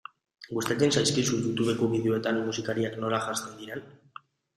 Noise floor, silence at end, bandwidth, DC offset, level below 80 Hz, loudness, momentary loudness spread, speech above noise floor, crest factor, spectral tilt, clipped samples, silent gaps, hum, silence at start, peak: -51 dBFS; 0.65 s; 15.5 kHz; under 0.1%; -64 dBFS; -28 LUFS; 15 LU; 24 dB; 18 dB; -4.5 dB/octave; under 0.1%; none; none; 0.4 s; -10 dBFS